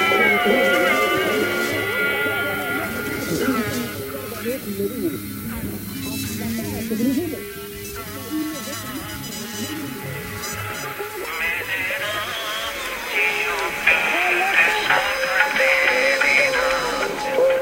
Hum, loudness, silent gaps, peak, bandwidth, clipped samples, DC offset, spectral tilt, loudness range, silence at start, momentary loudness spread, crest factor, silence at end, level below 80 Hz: none; -21 LUFS; none; 0 dBFS; 16 kHz; under 0.1%; under 0.1%; -3.5 dB/octave; 10 LU; 0 s; 13 LU; 22 dB; 0 s; -48 dBFS